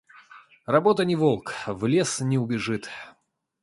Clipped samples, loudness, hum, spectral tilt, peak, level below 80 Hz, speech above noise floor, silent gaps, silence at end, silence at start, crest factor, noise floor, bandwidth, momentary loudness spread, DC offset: under 0.1%; -24 LUFS; none; -5.5 dB/octave; -4 dBFS; -62 dBFS; 27 dB; none; 0.55 s; 0.3 s; 20 dB; -51 dBFS; 11.5 kHz; 14 LU; under 0.1%